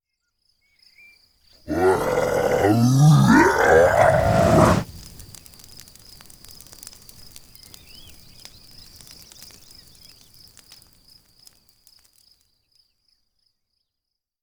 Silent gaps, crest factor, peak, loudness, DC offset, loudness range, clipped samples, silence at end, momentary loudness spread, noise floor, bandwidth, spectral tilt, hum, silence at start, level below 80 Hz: none; 20 dB; -2 dBFS; -17 LUFS; under 0.1%; 7 LU; under 0.1%; 9.2 s; 28 LU; -83 dBFS; over 20 kHz; -6.5 dB/octave; none; 1.7 s; -42 dBFS